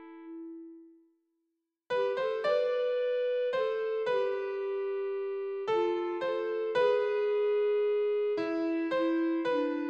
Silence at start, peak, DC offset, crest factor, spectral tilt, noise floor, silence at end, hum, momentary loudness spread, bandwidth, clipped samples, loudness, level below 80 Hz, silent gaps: 0 s; -16 dBFS; under 0.1%; 14 dB; -5.5 dB/octave; -83 dBFS; 0 s; none; 7 LU; 7.6 kHz; under 0.1%; -31 LUFS; -80 dBFS; none